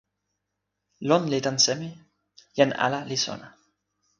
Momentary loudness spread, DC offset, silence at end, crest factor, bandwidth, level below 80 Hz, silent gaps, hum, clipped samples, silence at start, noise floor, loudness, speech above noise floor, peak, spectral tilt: 13 LU; under 0.1%; 0.7 s; 24 dB; 11 kHz; -70 dBFS; none; 50 Hz at -55 dBFS; under 0.1%; 1 s; -82 dBFS; -24 LUFS; 57 dB; -4 dBFS; -3.5 dB/octave